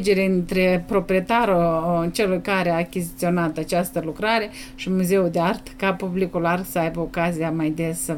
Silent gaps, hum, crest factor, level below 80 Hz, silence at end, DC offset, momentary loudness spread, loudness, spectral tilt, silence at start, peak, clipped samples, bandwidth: none; none; 14 dB; -44 dBFS; 0 s; under 0.1%; 6 LU; -22 LUFS; -5.5 dB/octave; 0 s; -8 dBFS; under 0.1%; 18 kHz